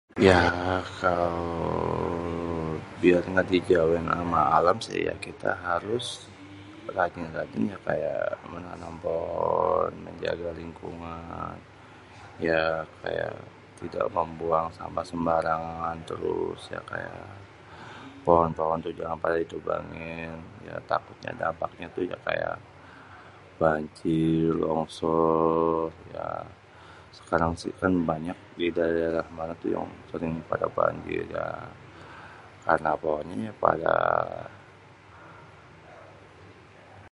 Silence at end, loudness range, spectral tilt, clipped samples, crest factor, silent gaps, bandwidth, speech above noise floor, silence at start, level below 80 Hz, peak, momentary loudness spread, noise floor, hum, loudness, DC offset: 0.05 s; 7 LU; -6.5 dB/octave; under 0.1%; 26 dB; none; 11.5 kHz; 24 dB; 0.15 s; -50 dBFS; -2 dBFS; 21 LU; -51 dBFS; none; -28 LUFS; under 0.1%